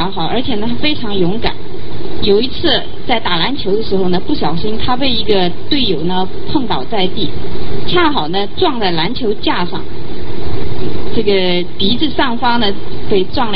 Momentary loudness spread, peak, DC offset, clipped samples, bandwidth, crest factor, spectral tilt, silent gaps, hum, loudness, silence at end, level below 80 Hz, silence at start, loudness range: 10 LU; 0 dBFS; 30%; under 0.1%; 5.8 kHz; 16 dB; -9 dB/octave; none; none; -16 LUFS; 0 s; -32 dBFS; 0 s; 2 LU